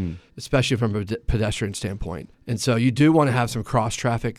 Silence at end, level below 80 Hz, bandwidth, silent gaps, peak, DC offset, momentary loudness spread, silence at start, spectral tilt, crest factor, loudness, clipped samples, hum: 0.05 s; -38 dBFS; 14 kHz; none; -6 dBFS; under 0.1%; 15 LU; 0 s; -6 dB/octave; 16 dB; -22 LUFS; under 0.1%; none